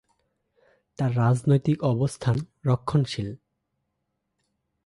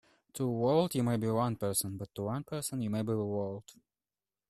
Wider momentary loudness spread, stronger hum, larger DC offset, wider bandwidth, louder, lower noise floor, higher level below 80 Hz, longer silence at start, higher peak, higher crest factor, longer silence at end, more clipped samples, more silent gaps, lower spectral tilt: about the same, 8 LU vs 10 LU; neither; neither; second, 11.5 kHz vs 14 kHz; first, -25 LUFS vs -33 LUFS; second, -79 dBFS vs under -90 dBFS; first, -56 dBFS vs -66 dBFS; first, 1 s vs 0.35 s; first, -10 dBFS vs -16 dBFS; about the same, 18 dB vs 18 dB; first, 1.5 s vs 0.75 s; neither; neither; first, -7.5 dB/octave vs -6 dB/octave